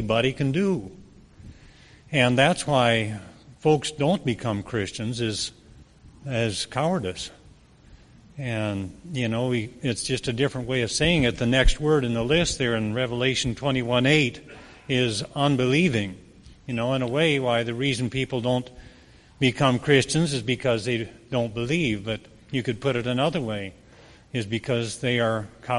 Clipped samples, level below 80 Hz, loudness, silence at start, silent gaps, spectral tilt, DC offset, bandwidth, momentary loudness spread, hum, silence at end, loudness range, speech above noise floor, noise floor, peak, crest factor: under 0.1%; -40 dBFS; -24 LUFS; 0 s; none; -5 dB/octave; under 0.1%; 11.5 kHz; 12 LU; none; 0 s; 6 LU; 28 dB; -52 dBFS; -2 dBFS; 22 dB